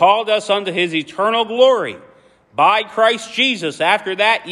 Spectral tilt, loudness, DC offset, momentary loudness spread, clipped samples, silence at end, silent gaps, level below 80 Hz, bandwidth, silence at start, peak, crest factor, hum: -3.5 dB/octave; -16 LUFS; under 0.1%; 5 LU; under 0.1%; 0 s; none; -68 dBFS; 12 kHz; 0 s; 0 dBFS; 16 dB; none